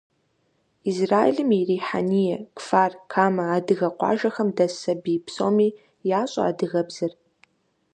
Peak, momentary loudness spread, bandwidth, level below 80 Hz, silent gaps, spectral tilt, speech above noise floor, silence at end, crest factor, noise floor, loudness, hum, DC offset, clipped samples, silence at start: -4 dBFS; 8 LU; 9.8 kHz; -70 dBFS; none; -6.5 dB/octave; 46 dB; 0.85 s; 20 dB; -68 dBFS; -23 LUFS; none; under 0.1%; under 0.1%; 0.85 s